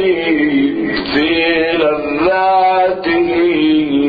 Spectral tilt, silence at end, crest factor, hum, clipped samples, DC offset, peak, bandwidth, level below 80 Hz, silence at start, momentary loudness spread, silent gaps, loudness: -8 dB/octave; 0 s; 10 dB; none; under 0.1%; under 0.1%; -2 dBFS; 5 kHz; -44 dBFS; 0 s; 4 LU; none; -13 LUFS